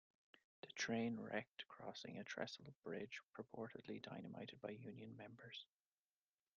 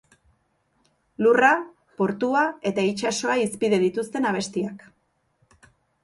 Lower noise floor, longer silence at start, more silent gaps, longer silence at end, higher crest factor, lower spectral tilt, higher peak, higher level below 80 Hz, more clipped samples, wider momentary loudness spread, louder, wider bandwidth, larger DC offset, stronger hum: first, under -90 dBFS vs -69 dBFS; second, 0.65 s vs 1.2 s; first, 1.49-1.55 s, 2.75-2.82 s, 3.23-3.29 s vs none; second, 0.9 s vs 1.25 s; about the same, 22 dB vs 20 dB; about the same, -3.5 dB/octave vs -4.5 dB/octave; second, -30 dBFS vs -4 dBFS; second, -88 dBFS vs -66 dBFS; neither; about the same, 12 LU vs 10 LU; second, -51 LUFS vs -23 LUFS; second, 7 kHz vs 11.5 kHz; neither; neither